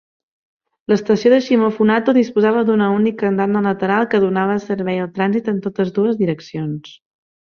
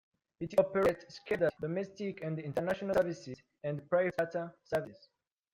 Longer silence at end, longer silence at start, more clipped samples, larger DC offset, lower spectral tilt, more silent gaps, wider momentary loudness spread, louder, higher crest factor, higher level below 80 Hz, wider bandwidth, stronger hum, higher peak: about the same, 0.6 s vs 0.6 s; first, 0.9 s vs 0.4 s; neither; neither; about the same, -7.5 dB/octave vs -7 dB/octave; neither; second, 8 LU vs 12 LU; first, -17 LUFS vs -34 LUFS; about the same, 16 dB vs 20 dB; first, -60 dBFS vs -66 dBFS; second, 6.8 kHz vs 16 kHz; neither; first, -2 dBFS vs -14 dBFS